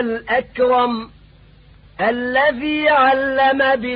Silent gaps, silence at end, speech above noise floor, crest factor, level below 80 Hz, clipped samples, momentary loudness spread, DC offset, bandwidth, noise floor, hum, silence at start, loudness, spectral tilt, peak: none; 0 s; 30 dB; 14 dB; -48 dBFS; under 0.1%; 7 LU; under 0.1%; 5.2 kHz; -47 dBFS; none; 0 s; -17 LUFS; -9.5 dB/octave; -4 dBFS